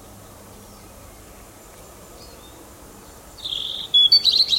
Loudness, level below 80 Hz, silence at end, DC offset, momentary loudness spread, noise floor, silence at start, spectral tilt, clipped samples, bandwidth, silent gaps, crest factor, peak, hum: -15 LUFS; -52 dBFS; 0 s; under 0.1%; 16 LU; -44 dBFS; 1.8 s; -1 dB/octave; under 0.1%; 16.5 kHz; none; 20 dB; -4 dBFS; none